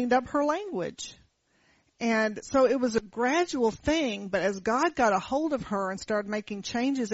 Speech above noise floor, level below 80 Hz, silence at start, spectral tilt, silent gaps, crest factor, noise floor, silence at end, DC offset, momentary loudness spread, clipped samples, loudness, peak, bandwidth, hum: 40 dB; -56 dBFS; 0 s; -3.5 dB/octave; none; 16 dB; -67 dBFS; 0 s; under 0.1%; 9 LU; under 0.1%; -28 LUFS; -12 dBFS; 8 kHz; none